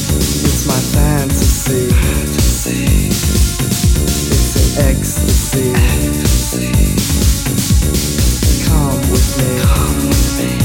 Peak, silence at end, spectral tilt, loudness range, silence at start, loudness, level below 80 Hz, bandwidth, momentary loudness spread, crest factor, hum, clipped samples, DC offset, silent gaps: 0 dBFS; 0 s; -4.5 dB/octave; 0 LU; 0 s; -13 LUFS; -16 dBFS; 17 kHz; 2 LU; 12 dB; none; under 0.1%; under 0.1%; none